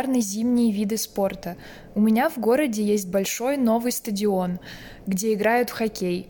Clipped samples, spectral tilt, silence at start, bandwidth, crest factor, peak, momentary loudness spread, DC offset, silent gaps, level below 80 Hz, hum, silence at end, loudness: under 0.1%; -5 dB/octave; 0 s; 17.5 kHz; 14 dB; -8 dBFS; 11 LU; under 0.1%; none; -54 dBFS; none; 0.05 s; -23 LUFS